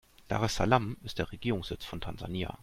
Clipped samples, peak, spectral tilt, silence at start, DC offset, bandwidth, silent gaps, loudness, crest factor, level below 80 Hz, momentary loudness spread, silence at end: under 0.1%; -8 dBFS; -5.5 dB/octave; 0.2 s; under 0.1%; 16 kHz; none; -33 LUFS; 24 dB; -48 dBFS; 12 LU; 0 s